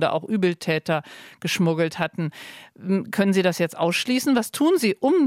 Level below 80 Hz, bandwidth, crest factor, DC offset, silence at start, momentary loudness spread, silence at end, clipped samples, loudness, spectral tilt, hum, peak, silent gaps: -70 dBFS; 16.5 kHz; 14 dB; under 0.1%; 0 s; 11 LU; 0 s; under 0.1%; -23 LUFS; -5.5 dB/octave; none; -8 dBFS; none